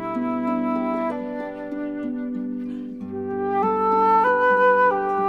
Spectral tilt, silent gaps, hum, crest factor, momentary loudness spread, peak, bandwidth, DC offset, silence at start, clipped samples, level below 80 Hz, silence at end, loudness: -7.5 dB/octave; none; none; 14 dB; 14 LU; -8 dBFS; 6.8 kHz; 0.1%; 0 s; under 0.1%; -64 dBFS; 0 s; -22 LUFS